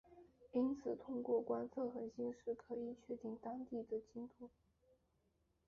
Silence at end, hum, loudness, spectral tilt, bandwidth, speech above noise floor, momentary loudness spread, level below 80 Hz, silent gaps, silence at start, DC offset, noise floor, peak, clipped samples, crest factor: 1.2 s; none; -45 LUFS; -8 dB/octave; 7 kHz; 37 dB; 12 LU; -78 dBFS; none; 0.1 s; under 0.1%; -81 dBFS; -28 dBFS; under 0.1%; 18 dB